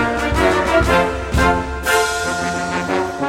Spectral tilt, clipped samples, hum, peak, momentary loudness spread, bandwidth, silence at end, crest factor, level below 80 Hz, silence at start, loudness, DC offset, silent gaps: -4.5 dB/octave; under 0.1%; none; -2 dBFS; 6 LU; 16.5 kHz; 0 s; 14 dB; -28 dBFS; 0 s; -17 LUFS; under 0.1%; none